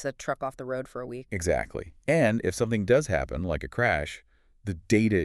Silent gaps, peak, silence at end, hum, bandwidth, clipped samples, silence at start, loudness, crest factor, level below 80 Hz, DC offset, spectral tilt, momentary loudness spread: none; -10 dBFS; 0 s; none; 13 kHz; under 0.1%; 0 s; -28 LUFS; 18 dB; -46 dBFS; under 0.1%; -6 dB/octave; 14 LU